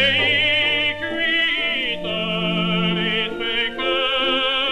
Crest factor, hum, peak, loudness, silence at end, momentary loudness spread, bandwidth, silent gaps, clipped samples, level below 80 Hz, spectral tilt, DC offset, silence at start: 16 dB; none; -6 dBFS; -19 LUFS; 0 s; 6 LU; 10.5 kHz; none; under 0.1%; -48 dBFS; -5 dB/octave; under 0.1%; 0 s